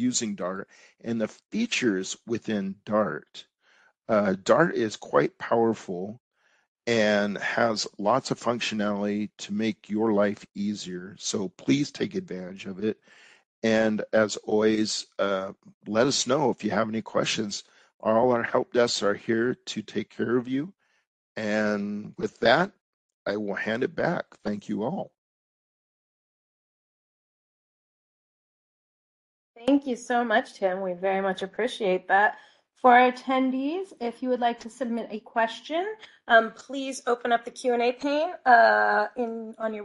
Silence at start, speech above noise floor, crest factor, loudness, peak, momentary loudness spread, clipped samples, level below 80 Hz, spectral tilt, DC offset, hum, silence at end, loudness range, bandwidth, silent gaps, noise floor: 0 s; 37 dB; 22 dB; -26 LUFS; -4 dBFS; 12 LU; under 0.1%; -68 dBFS; -4.5 dB/octave; under 0.1%; none; 0 s; 7 LU; 11.5 kHz; 6.20-6.31 s, 6.68-6.75 s, 13.46-13.62 s, 15.74-15.81 s, 17.94-17.99 s, 21.07-21.35 s, 22.81-23.26 s, 25.18-29.54 s; -63 dBFS